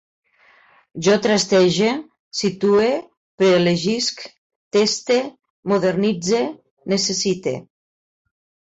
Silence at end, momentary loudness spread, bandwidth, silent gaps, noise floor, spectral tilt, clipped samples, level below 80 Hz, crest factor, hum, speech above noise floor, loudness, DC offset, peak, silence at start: 1.05 s; 14 LU; 8.2 kHz; 2.19-2.31 s, 3.17-3.38 s, 4.38-4.71 s, 5.50-5.63 s, 6.71-6.77 s; -54 dBFS; -4.5 dB/octave; under 0.1%; -60 dBFS; 16 dB; none; 36 dB; -19 LUFS; under 0.1%; -6 dBFS; 0.95 s